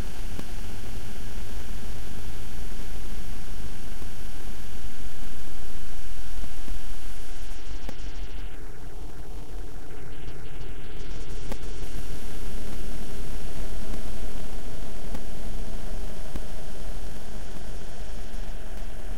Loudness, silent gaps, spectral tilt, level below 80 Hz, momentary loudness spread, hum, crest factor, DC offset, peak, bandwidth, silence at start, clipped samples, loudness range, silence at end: -40 LUFS; none; -5 dB/octave; -36 dBFS; 4 LU; none; 10 dB; 20%; -10 dBFS; 16 kHz; 0 s; under 0.1%; 3 LU; 0 s